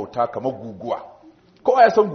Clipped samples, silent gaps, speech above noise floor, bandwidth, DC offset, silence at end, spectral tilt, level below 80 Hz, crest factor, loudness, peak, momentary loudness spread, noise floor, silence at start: under 0.1%; none; 28 dB; 6.4 kHz; under 0.1%; 0 s; -4 dB/octave; -64 dBFS; 18 dB; -20 LUFS; -2 dBFS; 15 LU; -47 dBFS; 0 s